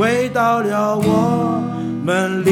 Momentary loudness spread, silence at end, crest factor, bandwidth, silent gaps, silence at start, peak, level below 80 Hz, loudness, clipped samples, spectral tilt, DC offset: 5 LU; 0 s; 14 dB; 16.5 kHz; none; 0 s; -2 dBFS; -52 dBFS; -17 LUFS; under 0.1%; -6.5 dB/octave; under 0.1%